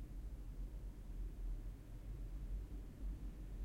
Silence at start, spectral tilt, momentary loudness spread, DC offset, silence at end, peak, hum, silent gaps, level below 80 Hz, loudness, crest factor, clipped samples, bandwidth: 0 s; -7.5 dB/octave; 4 LU; under 0.1%; 0 s; -36 dBFS; none; none; -48 dBFS; -52 LUFS; 10 dB; under 0.1%; 15 kHz